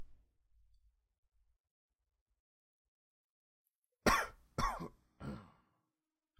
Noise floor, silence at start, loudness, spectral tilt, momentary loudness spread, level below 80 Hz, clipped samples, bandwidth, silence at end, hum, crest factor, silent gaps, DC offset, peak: under -90 dBFS; 0 s; -37 LUFS; -4 dB/octave; 19 LU; -54 dBFS; under 0.1%; 16 kHz; 0.95 s; none; 28 dB; 1.18-1.23 s, 1.60-1.64 s, 1.71-1.89 s, 2.21-2.26 s, 2.40-3.65 s, 3.78-3.82 s; under 0.1%; -16 dBFS